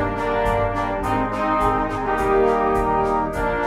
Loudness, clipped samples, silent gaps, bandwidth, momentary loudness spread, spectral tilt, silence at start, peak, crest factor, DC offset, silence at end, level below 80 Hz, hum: -20 LUFS; under 0.1%; none; 15.5 kHz; 4 LU; -7 dB/octave; 0 s; -6 dBFS; 14 dB; under 0.1%; 0 s; -34 dBFS; none